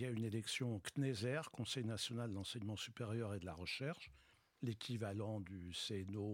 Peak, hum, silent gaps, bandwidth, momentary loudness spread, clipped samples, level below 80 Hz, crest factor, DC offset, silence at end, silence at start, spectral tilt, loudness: -30 dBFS; none; none; 16.5 kHz; 5 LU; under 0.1%; -76 dBFS; 16 dB; under 0.1%; 0 s; 0 s; -5 dB/octave; -45 LUFS